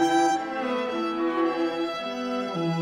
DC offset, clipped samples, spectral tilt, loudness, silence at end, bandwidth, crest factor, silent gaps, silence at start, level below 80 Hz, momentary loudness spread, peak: under 0.1%; under 0.1%; -5 dB/octave; -27 LUFS; 0 s; 12.5 kHz; 14 dB; none; 0 s; -68 dBFS; 6 LU; -12 dBFS